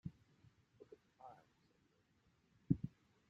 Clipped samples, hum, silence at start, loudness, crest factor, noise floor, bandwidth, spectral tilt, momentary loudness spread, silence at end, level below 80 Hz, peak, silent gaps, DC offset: under 0.1%; none; 0.05 s; -44 LUFS; 30 dB; -78 dBFS; 7.4 kHz; -11 dB/octave; 24 LU; 0.4 s; -70 dBFS; -20 dBFS; none; under 0.1%